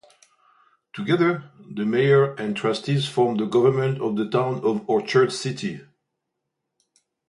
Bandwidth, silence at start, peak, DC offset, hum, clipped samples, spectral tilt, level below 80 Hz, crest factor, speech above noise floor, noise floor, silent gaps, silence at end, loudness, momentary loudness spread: 11.5 kHz; 0.95 s; -6 dBFS; under 0.1%; none; under 0.1%; -6.5 dB/octave; -68 dBFS; 18 dB; 59 dB; -80 dBFS; none; 1.5 s; -22 LUFS; 13 LU